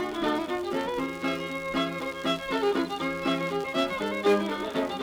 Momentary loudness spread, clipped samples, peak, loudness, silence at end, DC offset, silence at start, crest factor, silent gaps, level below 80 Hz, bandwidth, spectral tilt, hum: 5 LU; under 0.1%; -14 dBFS; -28 LUFS; 0 s; under 0.1%; 0 s; 16 dB; none; -58 dBFS; over 20 kHz; -5 dB/octave; none